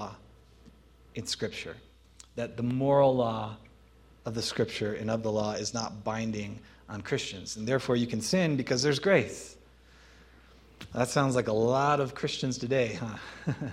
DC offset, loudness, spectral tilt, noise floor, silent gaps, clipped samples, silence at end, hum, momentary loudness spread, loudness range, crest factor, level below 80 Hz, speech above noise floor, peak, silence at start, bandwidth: under 0.1%; -30 LUFS; -5 dB/octave; -57 dBFS; none; under 0.1%; 0 s; none; 17 LU; 4 LU; 22 dB; -58 dBFS; 28 dB; -10 dBFS; 0 s; 15 kHz